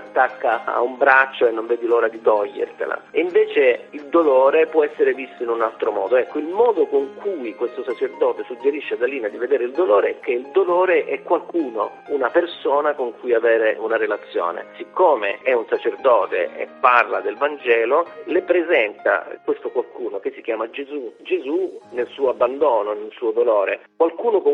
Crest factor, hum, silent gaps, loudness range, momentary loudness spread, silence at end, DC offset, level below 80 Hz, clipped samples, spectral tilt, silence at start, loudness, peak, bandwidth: 20 dB; none; none; 4 LU; 10 LU; 0 s; under 0.1%; -70 dBFS; under 0.1%; -5.5 dB/octave; 0 s; -20 LUFS; 0 dBFS; 5 kHz